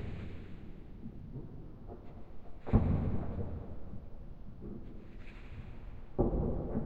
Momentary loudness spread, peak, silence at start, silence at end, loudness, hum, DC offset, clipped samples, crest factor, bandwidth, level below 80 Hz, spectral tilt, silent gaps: 19 LU; -16 dBFS; 0 s; 0 s; -38 LUFS; none; under 0.1%; under 0.1%; 22 dB; 4.9 kHz; -44 dBFS; -11 dB/octave; none